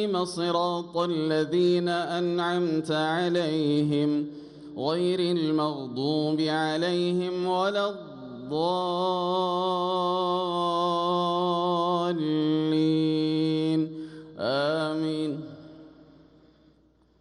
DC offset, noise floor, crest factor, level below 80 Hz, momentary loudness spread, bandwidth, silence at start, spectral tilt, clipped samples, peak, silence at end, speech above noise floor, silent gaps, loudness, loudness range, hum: under 0.1%; -62 dBFS; 14 dB; -70 dBFS; 8 LU; 11 kHz; 0 s; -6.5 dB/octave; under 0.1%; -14 dBFS; 1.3 s; 36 dB; none; -26 LUFS; 2 LU; none